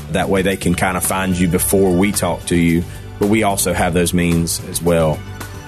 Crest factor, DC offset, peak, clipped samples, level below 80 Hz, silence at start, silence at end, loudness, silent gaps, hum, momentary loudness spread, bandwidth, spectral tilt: 12 dB; under 0.1%; -4 dBFS; under 0.1%; -34 dBFS; 0 s; 0 s; -16 LUFS; none; none; 5 LU; 14 kHz; -5 dB/octave